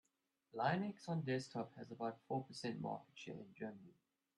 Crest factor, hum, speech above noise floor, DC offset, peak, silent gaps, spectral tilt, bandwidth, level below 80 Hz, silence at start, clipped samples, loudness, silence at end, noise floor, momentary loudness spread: 20 dB; none; 40 dB; under 0.1%; -26 dBFS; none; -6.5 dB/octave; 11.5 kHz; -84 dBFS; 0.55 s; under 0.1%; -45 LUFS; 0.5 s; -85 dBFS; 13 LU